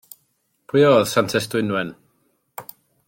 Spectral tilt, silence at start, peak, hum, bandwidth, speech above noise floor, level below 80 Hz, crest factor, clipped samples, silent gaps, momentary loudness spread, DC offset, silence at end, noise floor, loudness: -5 dB/octave; 0.75 s; -2 dBFS; none; 17 kHz; 50 dB; -62 dBFS; 20 dB; under 0.1%; none; 23 LU; under 0.1%; 0.45 s; -68 dBFS; -19 LUFS